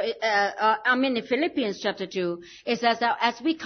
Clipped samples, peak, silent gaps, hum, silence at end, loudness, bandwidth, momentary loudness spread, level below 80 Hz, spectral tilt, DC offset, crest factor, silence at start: under 0.1%; -6 dBFS; none; none; 0 s; -25 LUFS; 6.6 kHz; 7 LU; -70 dBFS; -4 dB/octave; under 0.1%; 18 dB; 0 s